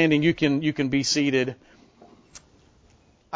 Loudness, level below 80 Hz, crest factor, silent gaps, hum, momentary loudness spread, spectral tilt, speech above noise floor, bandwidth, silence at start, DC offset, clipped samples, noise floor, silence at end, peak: -23 LUFS; -56 dBFS; 18 dB; none; none; 8 LU; -4.5 dB/octave; 36 dB; 8 kHz; 0 s; under 0.1%; under 0.1%; -58 dBFS; 0 s; -8 dBFS